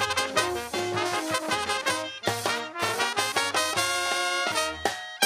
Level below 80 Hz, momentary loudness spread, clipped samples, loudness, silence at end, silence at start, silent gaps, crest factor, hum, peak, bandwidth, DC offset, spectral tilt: -60 dBFS; 4 LU; under 0.1%; -26 LUFS; 0 s; 0 s; none; 24 dB; none; -4 dBFS; 16 kHz; under 0.1%; -1.5 dB/octave